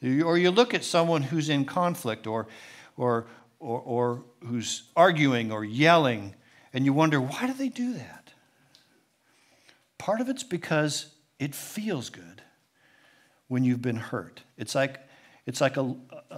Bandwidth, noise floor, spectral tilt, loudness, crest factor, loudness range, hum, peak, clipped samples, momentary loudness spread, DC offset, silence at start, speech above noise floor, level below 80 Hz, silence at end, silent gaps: 16 kHz; -66 dBFS; -5 dB/octave; -27 LUFS; 24 dB; 9 LU; none; -4 dBFS; under 0.1%; 19 LU; under 0.1%; 0 s; 40 dB; -78 dBFS; 0 s; none